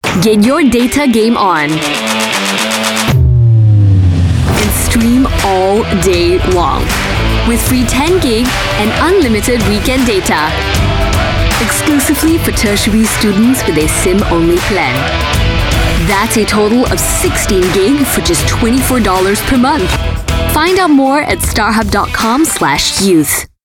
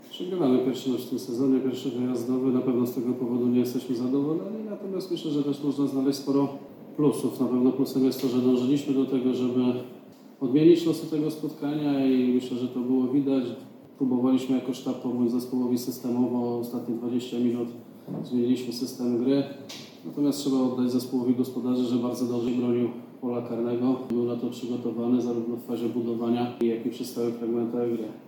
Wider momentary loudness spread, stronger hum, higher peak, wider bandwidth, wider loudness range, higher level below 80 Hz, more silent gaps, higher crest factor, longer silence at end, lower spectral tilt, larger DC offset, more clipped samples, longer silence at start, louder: second, 4 LU vs 8 LU; neither; first, 0 dBFS vs -8 dBFS; about the same, 19 kHz vs 18.5 kHz; second, 1 LU vs 4 LU; first, -20 dBFS vs -78 dBFS; neither; second, 10 dB vs 18 dB; first, 0.2 s vs 0 s; second, -4.5 dB/octave vs -7 dB/octave; neither; neither; about the same, 0.05 s vs 0.05 s; first, -10 LUFS vs -27 LUFS